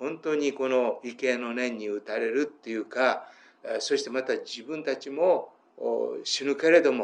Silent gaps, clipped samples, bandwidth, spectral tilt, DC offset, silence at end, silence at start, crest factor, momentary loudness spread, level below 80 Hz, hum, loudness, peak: none; under 0.1%; 9.8 kHz; -3 dB/octave; under 0.1%; 0 s; 0 s; 20 dB; 9 LU; under -90 dBFS; none; -28 LUFS; -8 dBFS